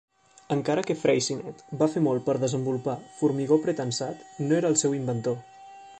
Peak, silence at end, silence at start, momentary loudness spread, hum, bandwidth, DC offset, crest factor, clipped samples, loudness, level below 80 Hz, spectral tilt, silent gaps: -8 dBFS; 0 s; 0.5 s; 10 LU; none; 9 kHz; under 0.1%; 18 dB; under 0.1%; -26 LUFS; -66 dBFS; -5 dB/octave; none